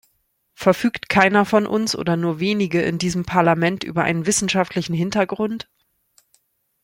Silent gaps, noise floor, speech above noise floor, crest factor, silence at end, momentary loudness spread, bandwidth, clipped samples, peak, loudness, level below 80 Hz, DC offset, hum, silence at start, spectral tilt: none; -68 dBFS; 49 dB; 20 dB; 1.2 s; 7 LU; 16.5 kHz; under 0.1%; -2 dBFS; -19 LUFS; -52 dBFS; under 0.1%; none; 0.6 s; -4.5 dB/octave